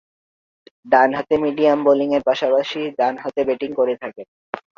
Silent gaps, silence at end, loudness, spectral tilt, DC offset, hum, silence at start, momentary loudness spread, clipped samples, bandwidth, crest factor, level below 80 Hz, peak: 4.28-4.53 s; 0.2 s; -19 LUFS; -6 dB/octave; under 0.1%; none; 0.85 s; 11 LU; under 0.1%; 7 kHz; 18 dB; -62 dBFS; -2 dBFS